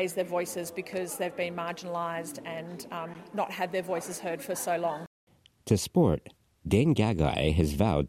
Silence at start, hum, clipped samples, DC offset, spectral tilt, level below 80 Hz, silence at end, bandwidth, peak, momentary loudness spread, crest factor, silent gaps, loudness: 0 s; none; under 0.1%; under 0.1%; -6 dB/octave; -48 dBFS; 0 s; 16 kHz; -10 dBFS; 13 LU; 20 dB; 5.07-5.27 s; -30 LUFS